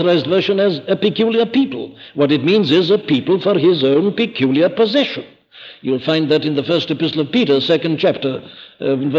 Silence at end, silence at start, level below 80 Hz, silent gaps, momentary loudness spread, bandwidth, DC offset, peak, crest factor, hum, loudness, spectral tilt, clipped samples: 0 s; 0 s; -62 dBFS; none; 8 LU; 7.4 kHz; under 0.1%; -4 dBFS; 12 dB; none; -16 LUFS; -7 dB/octave; under 0.1%